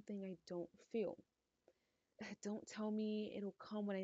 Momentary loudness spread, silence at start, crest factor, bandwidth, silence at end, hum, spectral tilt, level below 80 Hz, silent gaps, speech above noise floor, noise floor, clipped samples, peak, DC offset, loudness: 8 LU; 0.05 s; 14 dB; 8 kHz; 0 s; none; -6 dB/octave; -86 dBFS; none; 36 dB; -83 dBFS; under 0.1%; -32 dBFS; under 0.1%; -47 LUFS